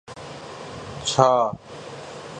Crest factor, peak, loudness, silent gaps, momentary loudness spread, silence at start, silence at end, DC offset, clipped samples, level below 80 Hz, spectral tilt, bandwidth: 24 dB; 0 dBFS; -21 LUFS; none; 20 LU; 0.1 s; 0 s; under 0.1%; under 0.1%; -56 dBFS; -4 dB/octave; 10.5 kHz